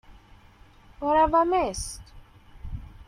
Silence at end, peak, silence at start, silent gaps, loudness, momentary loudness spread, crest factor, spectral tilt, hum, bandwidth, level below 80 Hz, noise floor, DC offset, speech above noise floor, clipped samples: 0.05 s; -10 dBFS; 0.1 s; none; -24 LUFS; 22 LU; 18 dB; -4.5 dB/octave; none; 14.5 kHz; -44 dBFS; -53 dBFS; under 0.1%; 30 dB; under 0.1%